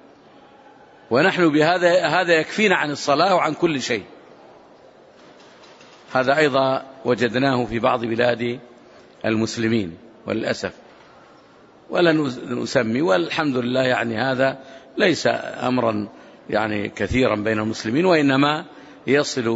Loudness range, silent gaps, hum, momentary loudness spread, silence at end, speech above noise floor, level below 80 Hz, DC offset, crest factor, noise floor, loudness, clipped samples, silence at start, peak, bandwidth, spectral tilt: 6 LU; none; none; 10 LU; 0 s; 30 dB; -54 dBFS; under 0.1%; 18 dB; -49 dBFS; -20 LUFS; under 0.1%; 1.1 s; -4 dBFS; 8 kHz; -5 dB/octave